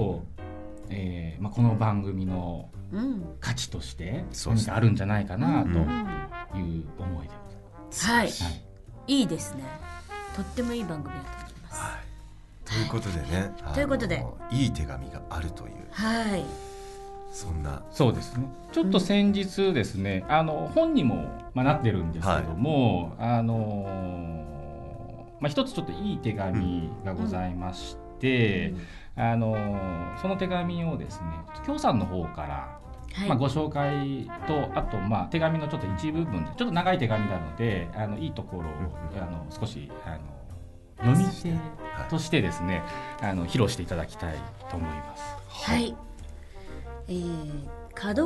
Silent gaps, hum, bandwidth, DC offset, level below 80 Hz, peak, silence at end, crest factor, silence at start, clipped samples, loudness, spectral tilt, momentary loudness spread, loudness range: none; none; 12 kHz; under 0.1%; -42 dBFS; -10 dBFS; 0 s; 20 dB; 0 s; under 0.1%; -29 LUFS; -6 dB/octave; 16 LU; 7 LU